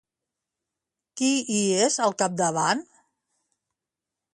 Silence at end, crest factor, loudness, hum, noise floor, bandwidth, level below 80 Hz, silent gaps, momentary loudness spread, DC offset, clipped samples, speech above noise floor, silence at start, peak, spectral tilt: 1.5 s; 20 dB; -24 LUFS; none; -87 dBFS; 11.5 kHz; -72 dBFS; none; 6 LU; under 0.1%; under 0.1%; 64 dB; 1.15 s; -8 dBFS; -3 dB/octave